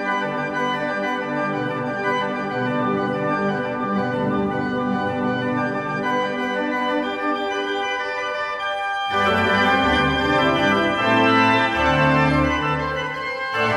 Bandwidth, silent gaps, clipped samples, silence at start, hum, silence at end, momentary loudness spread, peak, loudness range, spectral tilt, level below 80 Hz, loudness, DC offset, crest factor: 13 kHz; none; under 0.1%; 0 s; none; 0 s; 7 LU; -4 dBFS; 6 LU; -5.5 dB/octave; -44 dBFS; -21 LUFS; under 0.1%; 16 dB